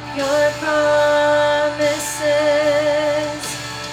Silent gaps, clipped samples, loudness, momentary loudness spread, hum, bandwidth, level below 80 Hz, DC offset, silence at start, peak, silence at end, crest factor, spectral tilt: none; under 0.1%; -17 LUFS; 8 LU; 60 Hz at -40 dBFS; 16.5 kHz; -50 dBFS; under 0.1%; 0 s; -6 dBFS; 0 s; 12 dB; -3 dB/octave